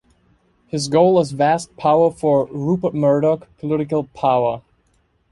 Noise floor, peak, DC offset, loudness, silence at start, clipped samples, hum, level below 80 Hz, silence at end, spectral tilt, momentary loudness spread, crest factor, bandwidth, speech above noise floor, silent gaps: -62 dBFS; -2 dBFS; under 0.1%; -18 LUFS; 0.75 s; under 0.1%; none; -54 dBFS; 0.75 s; -6.5 dB/octave; 8 LU; 16 dB; 11.5 kHz; 45 dB; none